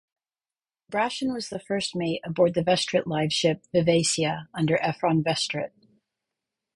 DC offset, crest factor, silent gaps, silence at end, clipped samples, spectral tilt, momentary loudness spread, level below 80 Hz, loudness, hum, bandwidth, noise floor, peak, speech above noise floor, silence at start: under 0.1%; 18 dB; none; 1.05 s; under 0.1%; -4.5 dB/octave; 8 LU; -62 dBFS; -25 LUFS; none; 11.5 kHz; under -90 dBFS; -8 dBFS; over 65 dB; 0.9 s